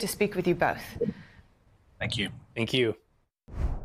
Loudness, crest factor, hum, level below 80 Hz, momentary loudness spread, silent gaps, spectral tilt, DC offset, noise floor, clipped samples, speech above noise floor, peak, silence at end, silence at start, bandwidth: -30 LUFS; 18 dB; none; -42 dBFS; 12 LU; none; -5 dB/octave; under 0.1%; -61 dBFS; under 0.1%; 32 dB; -12 dBFS; 0 s; 0 s; 15.5 kHz